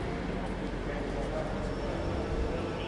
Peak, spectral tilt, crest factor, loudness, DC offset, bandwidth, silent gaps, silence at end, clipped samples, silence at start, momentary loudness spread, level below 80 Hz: -20 dBFS; -6.5 dB/octave; 12 dB; -35 LUFS; under 0.1%; 11 kHz; none; 0 s; under 0.1%; 0 s; 2 LU; -38 dBFS